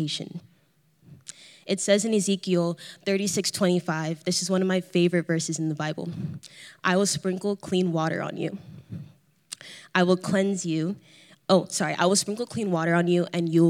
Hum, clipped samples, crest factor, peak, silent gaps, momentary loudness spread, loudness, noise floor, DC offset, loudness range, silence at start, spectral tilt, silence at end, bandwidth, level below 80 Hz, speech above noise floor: none; under 0.1%; 20 dB; -6 dBFS; none; 19 LU; -25 LUFS; -64 dBFS; under 0.1%; 3 LU; 0 s; -4.5 dB/octave; 0 s; 14 kHz; -74 dBFS; 39 dB